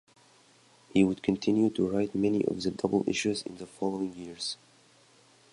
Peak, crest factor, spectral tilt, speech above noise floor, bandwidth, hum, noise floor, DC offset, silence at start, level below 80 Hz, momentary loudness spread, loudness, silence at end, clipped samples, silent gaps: -10 dBFS; 20 dB; -5.5 dB/octave; 32 dB; 11 kHz; none; -61 dBFS; under 0.1%; 0.95 s; -62 dBFS; 10 LU; -29 LUFS; 1 s; under 0.1%; none